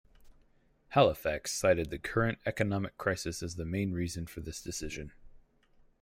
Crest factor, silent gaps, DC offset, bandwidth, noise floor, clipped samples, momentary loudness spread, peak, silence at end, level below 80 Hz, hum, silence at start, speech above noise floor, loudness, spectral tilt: 22 dB; none; under 0.1%; 16 kHz; -66 dBFS; under 0.1%; 14 LU; -12 dBFS; 0.6 s; -54 dBFS; none; 0.2 s; 34 dB; -33 LUFS; -5 dB/octave